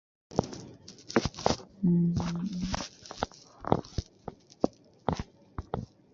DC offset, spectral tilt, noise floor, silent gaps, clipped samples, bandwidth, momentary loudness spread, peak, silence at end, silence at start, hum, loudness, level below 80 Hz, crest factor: under 0.1%; -6 dB/octave; -50 dBFS; none; under 0.1%; 7.6 kHz; 18 LU; -4 dBFS; 0.3 s; 0.3 s; none; -33 LUFS; -48 dBFS; 28 dB